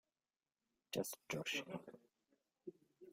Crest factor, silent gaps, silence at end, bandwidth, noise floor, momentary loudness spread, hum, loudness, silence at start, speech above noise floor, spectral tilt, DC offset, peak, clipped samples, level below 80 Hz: 22 dB; none; 0 s; 16 kHz; under -90 dBFS; 20 LU; none; -45 LUFS; 0.9 s; over 44 dB; -3.5 dB/octave; under 0.1%; -28 dBFS; under 0.1%; -86 dBFS